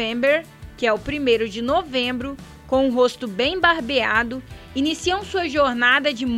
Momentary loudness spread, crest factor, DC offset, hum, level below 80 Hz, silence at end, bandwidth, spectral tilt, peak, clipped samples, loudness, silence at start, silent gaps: 8 LU; 18 dB; under 0.1%; none; -44 dBFS; 0 s; 15.5 kHz; -4 dB/octave; -2 dBFS; under 0.1%; -20 LUFS; 0 s; none